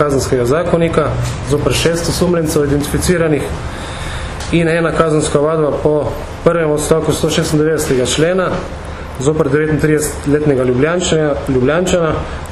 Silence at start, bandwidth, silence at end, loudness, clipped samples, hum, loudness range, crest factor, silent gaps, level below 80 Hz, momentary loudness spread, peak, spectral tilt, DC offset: 0 s; 14 kHz; 0 s; -14 LUFS; under 0.1%; none; 1 LU; 14 dB; none; -28 dBFS; 9 LU; 0 dBFS; -5.5 dB/octave; under 0.1%